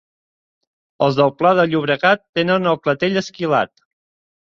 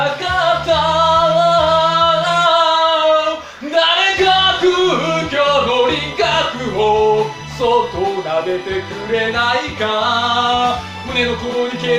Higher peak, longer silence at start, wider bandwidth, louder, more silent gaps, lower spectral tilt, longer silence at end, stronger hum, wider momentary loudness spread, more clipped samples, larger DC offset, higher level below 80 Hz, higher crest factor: about the same, -2 dBFS vs -2 dBFS; first, 1 s vs 0 s; second, 7.4 kHz vs 12 kHz; second, -17 LUFS vs -14 LUFS; first, 2.29-2.33 s vs none; first, -6 dB/octave vs -4 dB/octave; first, 0.85 s vs 0 s; neither; second, 5 LU vs 8 LU; neither; neither; second, -60 dBFS vs -42 dBFS; about the same, 16 dB vs 14 dB